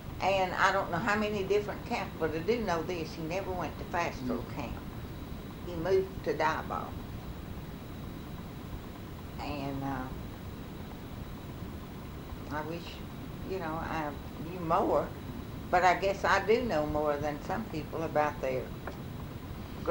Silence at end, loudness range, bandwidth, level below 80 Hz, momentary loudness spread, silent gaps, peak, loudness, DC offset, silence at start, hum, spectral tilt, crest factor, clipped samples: 0 s; 11 LU; over 20 kHz; -48 dBFS; 15 LU; none; -12 dBFS; -34 LUFS; under 0.1%; 0 s; none; -6 dB/octave; 22 dB; under 0.1%